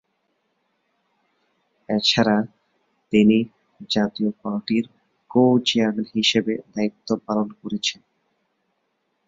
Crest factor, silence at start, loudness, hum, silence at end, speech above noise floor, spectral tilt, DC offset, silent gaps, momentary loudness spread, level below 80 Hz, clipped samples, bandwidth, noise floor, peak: 20 dB; 1.9 s; -21 LUFS; none; 1.35 s; 52 dB; -5 dB/octave; under 0.1%; none; 11 LU; -62 dBFS; under 0.1%; 7.8 kHz; -72 dBFS; -4 dBFS